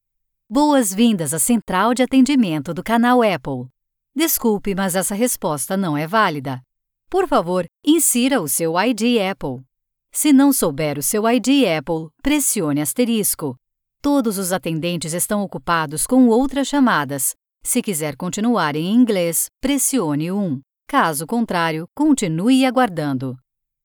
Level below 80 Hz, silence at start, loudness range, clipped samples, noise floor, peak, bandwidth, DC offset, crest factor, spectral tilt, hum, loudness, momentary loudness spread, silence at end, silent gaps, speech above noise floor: -46 dBFS; 0.5 s; 3 LU; under 0.1%; -74 dBFS; -4 dBFS; over 20 kHz; under 0.1%; 16 dB; -4 dB/octave; none; -18 LUFS; 9 LU; 0.5 s; none; 56 dB